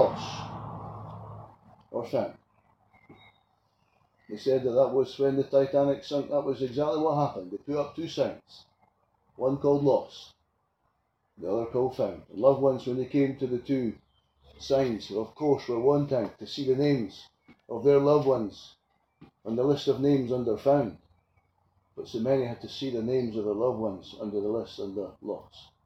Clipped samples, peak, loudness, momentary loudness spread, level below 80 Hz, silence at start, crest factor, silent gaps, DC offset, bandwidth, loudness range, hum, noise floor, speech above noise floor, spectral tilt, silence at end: under 0.1%; -8 dBFS; -28 LUFS; 16 LU; -64 dBFS; 0 s; 22 dB; none; under 0.1%; 8 kHz; 5 LU; none; -75 dBFS; 47 dB; -7.5 dB/octave; 0.25 s